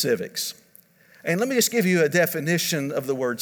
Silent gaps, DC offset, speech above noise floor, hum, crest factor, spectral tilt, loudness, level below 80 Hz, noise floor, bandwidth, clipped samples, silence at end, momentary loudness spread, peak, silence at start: none; under 0.1%; 32 dB; none; 18 dB; -4 dB/octave; -23 LUFS; -74 dBFS; -55 dBFS; over 20 kHz; under 0.1%; 0 s; 9 LU; -6 dBFS; 0 s